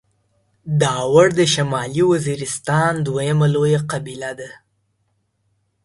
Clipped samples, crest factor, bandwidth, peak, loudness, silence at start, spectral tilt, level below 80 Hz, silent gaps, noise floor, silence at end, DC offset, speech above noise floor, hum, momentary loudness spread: under 0.1%; 18 dB; 11.5 kHz; 0 dBFS; -18 LUFS; 0.65 s; -5 dB/octave; -54 dBFS; none; -68 dBFS; 1.3 s; under 0.1%; 50 dB; none; 15 LU